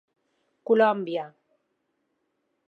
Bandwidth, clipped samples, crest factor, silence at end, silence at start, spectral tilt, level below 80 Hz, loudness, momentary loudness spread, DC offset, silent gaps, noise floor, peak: 4.7 kHz; under 0.1%; 20 dB; 1.4 s; 0.7 s; -7.5 dB/octave; -88 dBFS; -24 LUFS; 22 LU; under 0.1%; none; -76 dBFS; -8 dBFS